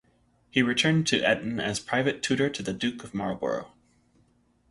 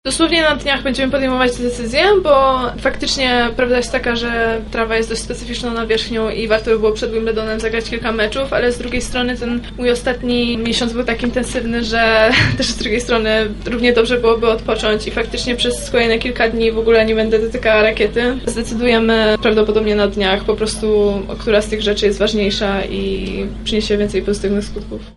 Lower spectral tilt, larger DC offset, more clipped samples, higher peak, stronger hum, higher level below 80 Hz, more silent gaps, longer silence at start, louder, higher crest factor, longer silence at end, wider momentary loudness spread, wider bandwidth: about the same, -4.5 dB/octave vs -4 dB/octave; neither; neither; second, -8 dBFS vs 0 dBFS; first, 60 Hz at -55 dBFS vs none; second, -60 dBFS vs -30 dBFS; neither; first, 0.55 s vs 0.05 s; second, -27 LUFS vs -16 LUFS; about the same, 20 dB vs 16 dB; first, 1.05 s vs 0.05 s; about the same, 9 LU vs 7 LU; about the same, 11.5 kHz vs 11.5 kHz